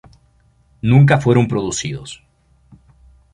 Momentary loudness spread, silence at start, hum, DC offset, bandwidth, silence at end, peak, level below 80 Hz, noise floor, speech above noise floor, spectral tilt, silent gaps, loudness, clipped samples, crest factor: 21 LU; 0.85 s; none; under 0.1%; 10.5 kHz; 1.2 s; 0 dBFS; -46 dBFS; -55 dBFS; 41 dB; -6.5 dB/octave; none; -15 LUFS; under 0.1%; 18 dB